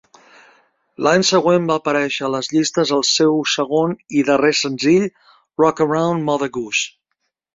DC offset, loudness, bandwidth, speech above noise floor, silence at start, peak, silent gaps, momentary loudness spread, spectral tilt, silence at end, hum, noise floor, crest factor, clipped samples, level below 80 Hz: under 0.1%; -17 LUFS; 7.8 kHz; 57 dB; 1 s; 0 dBFS; none; 6 LU; -4 dB/octave; 0.65 s; none; -74 dBFS; 18 dB; under 0.1%; -60 dBFS